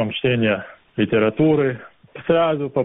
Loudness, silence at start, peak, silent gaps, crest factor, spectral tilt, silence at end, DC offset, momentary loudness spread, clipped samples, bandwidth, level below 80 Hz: -19 LUFS; 0 s; -4 dBFS; none; 14 dB; -5 dB/octave; 0 s; under 0.1%; 12 LU; under 0.1%; 3.9 kHz; -54 dBFS